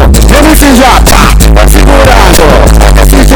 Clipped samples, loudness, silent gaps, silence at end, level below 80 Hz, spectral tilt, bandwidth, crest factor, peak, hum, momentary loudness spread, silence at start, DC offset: 8%; -3 LUFS; none; 0 s; -4 dBFS; -4.5 dB/octave; 19.5 kHz; 2 dB; 0 dBFS; none; 2 LU; 0 s; 4%